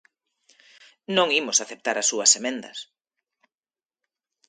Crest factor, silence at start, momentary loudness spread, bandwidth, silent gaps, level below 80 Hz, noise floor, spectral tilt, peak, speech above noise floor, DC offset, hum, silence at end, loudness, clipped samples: 24 dB; 1.1 s; 16 LU; 10.5 kHz; none; -80 dBFS; under -90 dBFS; -0.5 dB/octave; -4 dBFS; over 67 dB; under 0.1%; none; 1.65 s; -21 LUFS; under 0.1%